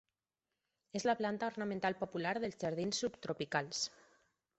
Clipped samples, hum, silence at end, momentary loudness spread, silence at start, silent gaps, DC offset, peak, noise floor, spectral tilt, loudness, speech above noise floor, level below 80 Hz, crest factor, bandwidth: under 0.1%; none; 0.7 s; 5 LU; 0.95 s; none; under 0.1%; -18 dBFS; under -90 dBFS; -4 dB/octave; -38 LUFS; over 52 dB; -74 dBFS; 22 dB; 8.2 kHz